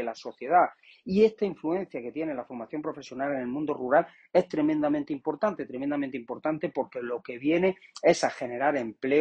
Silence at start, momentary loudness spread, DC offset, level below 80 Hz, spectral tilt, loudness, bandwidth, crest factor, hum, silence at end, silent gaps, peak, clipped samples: 0 s; 11 LU; under 0.1%; -68 dBFS; -6 dB/octave; -28 LUFS; 9.2 kHz; 20 dB; none; 0 s; none; -8 dBFS; under 0.1%